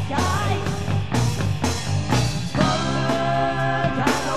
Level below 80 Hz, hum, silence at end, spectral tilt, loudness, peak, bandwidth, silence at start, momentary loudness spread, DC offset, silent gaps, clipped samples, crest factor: -38 dBFS; none; 0 s; -5 dB/octave; -22 LUFS; -6 dBFS; 14 kHz; 0 s; 3 LU; 2%; none; under 0.1%; 16 dB